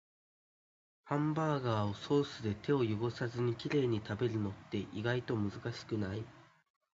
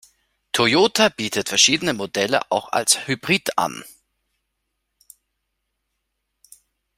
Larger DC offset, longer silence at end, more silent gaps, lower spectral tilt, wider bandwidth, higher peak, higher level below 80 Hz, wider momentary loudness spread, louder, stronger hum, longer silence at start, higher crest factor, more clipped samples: neither; second, 0.5 s vs 3.1 s; neither; first, -6 dB/octave vs -2 dB/octave; second, 7.6 kHz vs 16 kHz; second, -18 dBFS vs 0 dBFS; about the same, -64 dBFS vs -62 dBFS; about the same, 7 LU vs 9 LU; second, -36 LUFS vs -19 LUFS; neither; first, 1.05 s vs 0.55 s; about the same, 18 dB vs 22 dB; neither